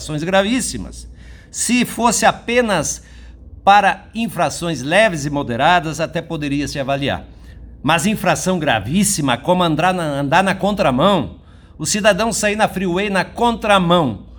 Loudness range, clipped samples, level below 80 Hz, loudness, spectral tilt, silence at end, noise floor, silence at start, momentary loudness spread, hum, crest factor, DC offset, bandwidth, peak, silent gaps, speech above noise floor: 2 LU; under 0.1%; -40 dBFS; -17 LUFS; -4 dB/octave; 0 s; -37 dBFS; 0 s; 9 LU; none; 18 dB; under 0.1%; over 20 kHz; 0 dBFS; none; 21 dB